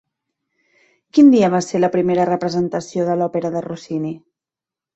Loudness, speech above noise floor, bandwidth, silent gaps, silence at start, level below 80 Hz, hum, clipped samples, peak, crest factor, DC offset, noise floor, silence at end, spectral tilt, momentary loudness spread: -17 LUFS; 72 dB; 8.2 kHz; none; 1.15 s; -60 dBFS; none; under 0.1%; -2 dBFS; 16 dB; under 0.1%; -89 dBFS; 0.8 s; -6.5 dB/octave; 14 LU